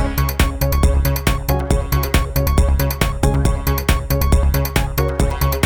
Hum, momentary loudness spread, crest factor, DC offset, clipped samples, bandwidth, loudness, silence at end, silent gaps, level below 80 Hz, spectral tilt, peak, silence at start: none; 3 LU; 14 dB; 0.3%; under 0.1%; 19 kHz; -18 LUFS; 0 s; none; -18 dBFS; -5.5 dB/octave; -2 dBFS; 0 s